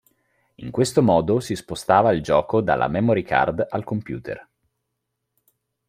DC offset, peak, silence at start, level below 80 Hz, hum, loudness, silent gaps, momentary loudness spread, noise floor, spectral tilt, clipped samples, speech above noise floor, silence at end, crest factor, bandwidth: under 0.1%; -2 dBFS; 0.6 s; -52 dBFS; none; -21 LUFS; none; 14 LU; -78 dBFS; -6 dB/octave; under 0.1%; 58 dB; 1.45 s; 20 dB; 16 kHz